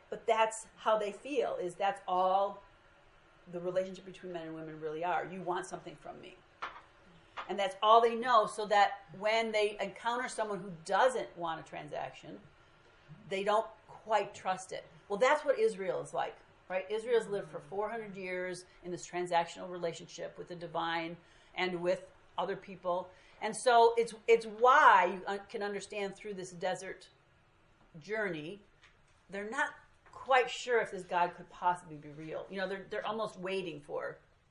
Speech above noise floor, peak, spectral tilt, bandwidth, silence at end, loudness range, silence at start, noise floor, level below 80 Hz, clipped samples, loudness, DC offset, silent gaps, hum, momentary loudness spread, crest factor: 33 dB; -10 dBFS; -3.5 dB/octave; 11.5 kHz; 0.35 s; 12 LU; 0.1 s; -66 dBFS; -72 dBFS; under 0.1%; -33 LUFS; under 0.1%; none; none; 17 LU; 24 dB